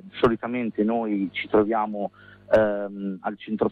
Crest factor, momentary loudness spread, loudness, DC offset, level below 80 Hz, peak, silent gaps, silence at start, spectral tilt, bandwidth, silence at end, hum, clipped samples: 16 dB; 10 LU; -25 LUFS; under 0.1%; -54 dBFS; -8 dBFS; none; 0.05 s; -8 dB/octave; 6.4 kHz; 0 s; none; under 0.1%